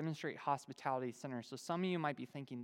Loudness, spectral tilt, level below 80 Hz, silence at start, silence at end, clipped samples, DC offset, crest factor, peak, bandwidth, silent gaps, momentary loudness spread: -42 LUFS; -6 dB/octave; under -90 dBFS; 0 s; 0 s; under 0.1%; under 0.1%; 20 dB; -22 dBFS; 16.5 kHz; none; 8 LU